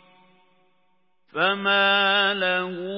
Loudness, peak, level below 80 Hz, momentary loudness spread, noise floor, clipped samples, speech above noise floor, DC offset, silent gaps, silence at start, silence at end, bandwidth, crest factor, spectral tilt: -20 LUFS; -8 dBFS; -86 dBFS; 7 LU; -70 dBFS; under 0.1%; 49 dB; under 0.1%; none; 1.35 s; 0 s; 5.8 kHz; 18 dB; -8 dB/octave